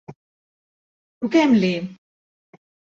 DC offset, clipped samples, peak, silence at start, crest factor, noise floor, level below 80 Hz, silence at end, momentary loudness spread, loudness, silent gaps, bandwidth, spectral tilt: under 0.1%; under 0.1%; -4 dBFS; 0.1 s; 20 dB; under -90 dBFS; -66 dBFS; 0.95 s; 15 LU; -19 LUFS; 0.16-1.21 s; 7.6 kHz; -6.5 dB/octave